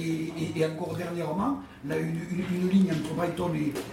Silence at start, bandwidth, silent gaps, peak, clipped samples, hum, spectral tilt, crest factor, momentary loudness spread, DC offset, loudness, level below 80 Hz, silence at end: 0 s; 16 kHz; none; -12 dBFS; under 0.1%; none; -7 dB/octave; 16 dB; 8 LU; under 0.1%; -29 LUFS; -58 dBFS; 0 s